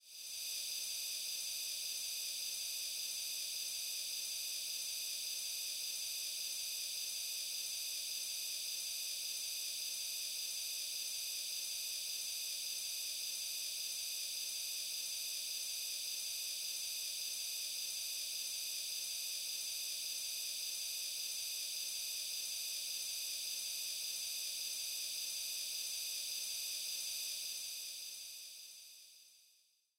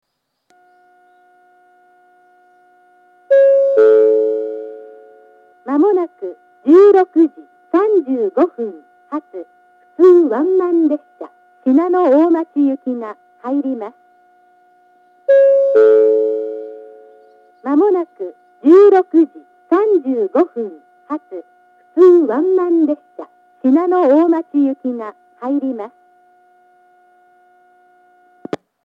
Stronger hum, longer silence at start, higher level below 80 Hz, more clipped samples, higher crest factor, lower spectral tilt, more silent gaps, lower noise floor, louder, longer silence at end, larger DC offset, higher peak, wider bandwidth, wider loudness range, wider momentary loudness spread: neither; second, 0.05 s vs 3.3 s; about the same, -88 dBFS vs -84 dBFS; neither; about the same, 12 dB vs 14 dB; second, 4.5 dB/octave vs -7.5 dB/octave; neither; first, -73 dBFS vs -62 dBFS; second, -39 LUFS vs -14 LUFS; second, 0.55 s vs 2.95 s; neither; second, -30 dBFS vs 0 dBFS; first, over 20 kHz vs 5.2 kHz; second, 0 LU vs 5 LU; second, 0 LU vs 21 LU